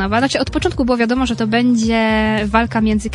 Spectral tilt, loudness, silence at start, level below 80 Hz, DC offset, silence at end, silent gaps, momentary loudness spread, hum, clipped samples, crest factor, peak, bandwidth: -5 dB/octave; -16 LUFS; 0 s; -32 dBFS; under 0.1%; 0 s; none; 3 LU; none; under 0.1%; 16 dB; 0 dBFS; 11 kHz